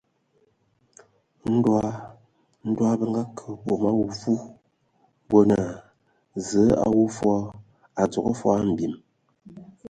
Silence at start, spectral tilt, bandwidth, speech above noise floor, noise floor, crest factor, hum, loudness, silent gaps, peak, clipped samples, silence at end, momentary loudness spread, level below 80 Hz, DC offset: 1.45 s; -7.5 dB/octave; 9.4 kHz; 44 dB; -67 dBFS; 20 dB; none; -24 LUFS; none; -4 dBFS; under 0.1%; 0 s; 17 LU; -54 dBFS; under 0.1%